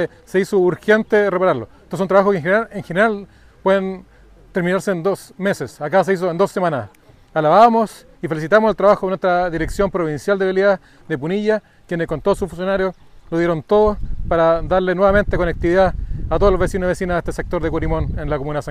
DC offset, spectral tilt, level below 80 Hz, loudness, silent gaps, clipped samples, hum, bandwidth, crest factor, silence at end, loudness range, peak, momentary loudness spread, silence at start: under 0.1%; -6.5 dB/octave; -32 dBFS; -18 LUFS; none; under 0.1%; none; 15 kHz; 16 dB; 0 s; 4 LU; 0 dBFS; 10 LU; 0 s